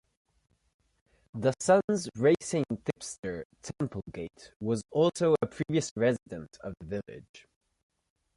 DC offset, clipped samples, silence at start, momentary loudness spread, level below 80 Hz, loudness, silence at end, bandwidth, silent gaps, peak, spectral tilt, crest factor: under 0.1%; under 0.1%; 1.35 s; 18 LU; -60 dBFS; -30 LUFS; 1 s; 11.5 kHz; 1.84-1.88 s, 3.19-3.23 s, 3.45-3.50 s, 4.56-4.60 s, 5.91-5.96 s, 7.29-7.34 s; -12 dBFS; -5.5 dB/octave; 20 dB